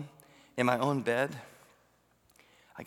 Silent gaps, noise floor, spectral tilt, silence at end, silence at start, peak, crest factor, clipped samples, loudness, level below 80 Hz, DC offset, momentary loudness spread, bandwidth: none; -68 dBFS; -6 dB/octave; 0 s; 0 s; -12 dBFS; 22 dB; under 0.1%; -31 LUFS; -78 dBFS; under 0.1%; 20 LU; 19 kHz